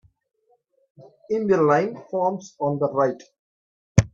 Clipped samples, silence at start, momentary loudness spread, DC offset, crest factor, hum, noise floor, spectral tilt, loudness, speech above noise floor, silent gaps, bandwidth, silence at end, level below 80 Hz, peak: under 0.1%; 1 s; 9 LU; under 0.1%; 24 dB; none; -65 dBFS; -7 dB/octave; -23 LUFS; 43 dB; 3.39-3.95 s; 8.2 kHz; 0.05 s; -50 dBFS; 0 dBFS